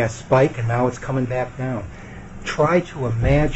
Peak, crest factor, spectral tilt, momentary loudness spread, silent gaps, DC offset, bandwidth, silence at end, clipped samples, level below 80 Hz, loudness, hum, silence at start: -4 dBFS; 16 dB; -7 dB/octave; 14 LU; none; under 0.1%; 8.2 kHz; 0 s; under 0.1%; -34 dBFS; -21 LUFS; none; 0 s